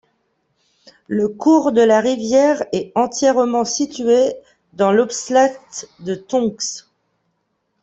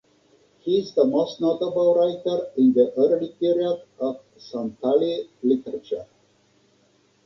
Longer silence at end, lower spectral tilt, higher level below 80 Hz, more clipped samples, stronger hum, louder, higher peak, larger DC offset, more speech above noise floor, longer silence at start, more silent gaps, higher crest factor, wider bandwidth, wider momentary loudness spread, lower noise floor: second, 1.05 s vs 1.2 s; second, -4 dB/octave vs -7.5 dB/octave; first, -62 dBFS vs -68 dBFS; neither; neither; first, -17 LUFS vs -23 LUFS; first, -2 dBFS vs -6 dBFS; neither; first, 53 dB vs 40 dB; first, 1.1 s vs 0.65 s; neither; about the same, 16 dB vs 16 dB; first, 8.4 kHz vs 6.6 kHz; about the same, 14 LU vs 12 LU; first, -70 dBFS vs -62 dBFS